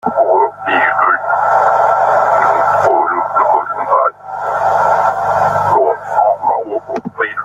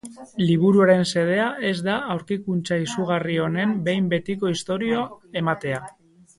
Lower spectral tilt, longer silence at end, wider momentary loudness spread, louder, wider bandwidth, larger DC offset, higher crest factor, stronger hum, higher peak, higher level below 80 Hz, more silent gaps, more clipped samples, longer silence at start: about the same, -5.5 dB/octave vs -6 dB/octave; second, 0 s vs 0.5 s; second, 7 LU vs 10 LU; first, -13 LUFS vs -22 LUFS; first, 13 kHz vs 11.5 kHz; neither; second, 12 dB vs 18 dB; first, 50 Hz at -45 dBFS vs none; about the same, -2 dBFS vs -4 dBFS; first, -56 dBFS vs -62 dBFS; neither; neither; about the same, 0.05 s vs 0.05 s